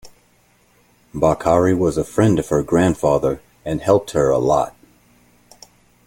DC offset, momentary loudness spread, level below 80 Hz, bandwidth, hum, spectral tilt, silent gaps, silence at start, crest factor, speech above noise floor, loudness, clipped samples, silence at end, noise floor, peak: under 0.1%; 8 LU; -44 dBFS; 17 kHz; none; -7 dB/octave; none; 0.05 s; 18 dB; 40 dB; -18 LUFS; under 0.1%; 1.35 s; -57 dBFS; -2 dBFS